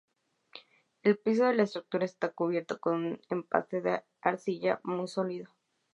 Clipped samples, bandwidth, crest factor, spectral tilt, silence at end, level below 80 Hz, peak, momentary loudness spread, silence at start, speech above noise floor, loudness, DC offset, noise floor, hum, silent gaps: under 0.1%; 11 kHz; 24 dB; -6.5 dB/octave; 0.45 s; -84 dBFS; -8 dBFS; 10 LU; 0.55 s; 25 dB; -31 LUFS; under 0.1%; -56 dBFS; none; none